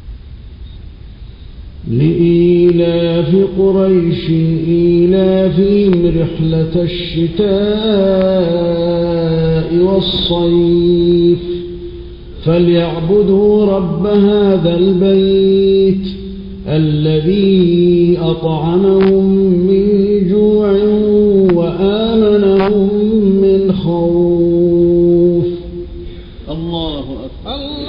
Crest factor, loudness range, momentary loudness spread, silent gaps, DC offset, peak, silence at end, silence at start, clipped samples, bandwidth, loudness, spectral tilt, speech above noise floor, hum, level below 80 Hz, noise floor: 10 dB; 3 LU; 12 LU; none; under 0.1%; 0 dBFS; 0 s; 0.05 s; under 0.1%; 5.4 kHz; -12 LUFS; -11 dB/octave; 21 dB; none; -32 dBFS; -31 dBFS